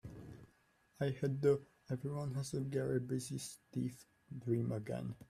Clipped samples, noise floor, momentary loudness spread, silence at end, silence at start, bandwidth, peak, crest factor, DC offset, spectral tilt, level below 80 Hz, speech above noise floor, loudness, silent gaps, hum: under 0.1%; -73 dBFS; 18 LU; 0.05 s; 0.05 s; 15 kHz; -20 dBFS; 20 dB; under 0.1%; -7 dB/octave; -70 dBFS; 34 dB; -40 LUFS; none; none